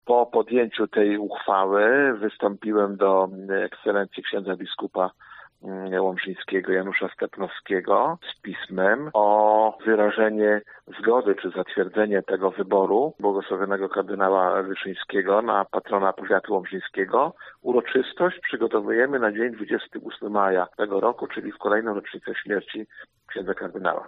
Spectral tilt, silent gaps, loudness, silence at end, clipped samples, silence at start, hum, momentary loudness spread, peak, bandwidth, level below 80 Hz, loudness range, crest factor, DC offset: -3 dB/octave; none; -24 LUFS; 0 s; under 0.1%; 0.05 s; none; 10 LU; -6 dBFS; 4.3 kHz; -70 dBFS; 5 LU; 18 dB; under 0.1%